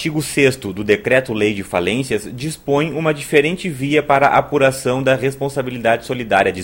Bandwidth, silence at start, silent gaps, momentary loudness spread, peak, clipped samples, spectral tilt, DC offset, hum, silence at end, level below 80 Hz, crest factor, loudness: 16.5 kHz; 0 s; none; 8 LU; 0 dBFS; under 0.1%; -5 dB/octave; under 0.1%; none; 0 s; -46 dBFS; 16 dB; -17 LUFS